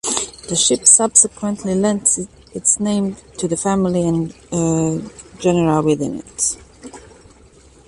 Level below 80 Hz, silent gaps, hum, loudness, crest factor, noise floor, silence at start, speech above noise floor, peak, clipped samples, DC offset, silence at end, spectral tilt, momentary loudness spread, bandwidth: -48 dBFS; none; none; -16 LUFS; 18 dB; -47 dBFS; 0.05 s; 29 dB; 0 dBFS; under 0.1%; under 0.1%; 0.9 s; -4 dB/octave; 14 LU; 11.5 kHz